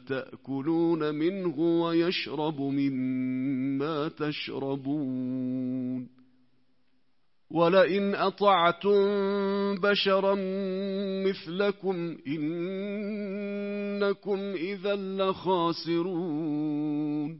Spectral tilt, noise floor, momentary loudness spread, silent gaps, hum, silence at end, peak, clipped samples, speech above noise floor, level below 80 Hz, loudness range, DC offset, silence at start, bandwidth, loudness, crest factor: -10 dB/octave; -77 dBFS; 10 LU; none; none; 0 s; -10 dBFS; under 0.1%; 49 dB; -76 dBFS; 7 LU; under 0.1%; 0.05 s; 5.8 kHz; -28 LUFS; 20 dB